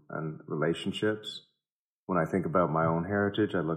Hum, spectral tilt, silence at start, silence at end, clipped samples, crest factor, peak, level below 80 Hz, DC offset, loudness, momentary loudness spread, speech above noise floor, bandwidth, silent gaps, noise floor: none; -7 dB/octave; 0.1 s; 0 s; under 0.1%; 18 dB; -12 dBFS; -64 dBFS; under 0.1%; -30 LUFS; 10 LU; over 61 dB; 11 kHz; 1.72-2.07 s; under -90 dBFS